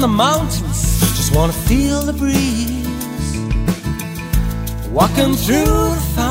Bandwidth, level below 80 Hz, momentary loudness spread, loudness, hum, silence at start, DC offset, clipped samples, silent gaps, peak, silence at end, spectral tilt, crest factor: 16.5 kHz; -22 dBFS; 8 LU; -17 LUFS; none; 0 s; under 0.1%; under 0.1%; none; -2 dBFS; 0 s; -5 dB/octave; 14 dB